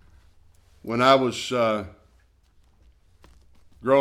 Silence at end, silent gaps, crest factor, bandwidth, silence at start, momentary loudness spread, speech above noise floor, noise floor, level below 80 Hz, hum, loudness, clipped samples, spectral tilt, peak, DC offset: 0 s; none; 22 dB; 14 kHz; 0.85 s; 19 LU; 38 dB; -60 dBFS; -58 dBFS; none; -22 LUFS; under 0.1%; -5 dB/octave; -4 dBFS; under 0.1%